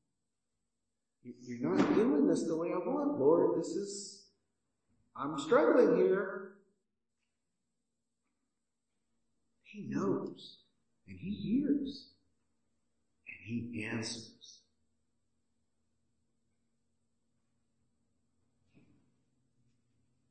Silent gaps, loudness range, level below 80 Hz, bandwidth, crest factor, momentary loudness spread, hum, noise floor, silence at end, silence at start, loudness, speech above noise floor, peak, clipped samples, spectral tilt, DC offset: none; 13 LU; -80 dBFS; 8.8 kHz; 22 dB; 23 LU; none; -89 dBFS; 5.8 s; 1.25 s; -32 LUFS; 57 dB; -16 dBFS; under 0.1%; -6 dB/octave; under 0.1%